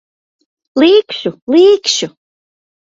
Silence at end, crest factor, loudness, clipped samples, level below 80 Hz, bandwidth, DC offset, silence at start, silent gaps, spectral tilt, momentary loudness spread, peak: 0.9 s; 14 dB; -11 LUFS; under 0.1%; -60 dBFS; 7.8 kHz; under 0.1%; 0.75 s; 1.42-1.47 s; -3 dB/octave; 12 LU; 0 dBFS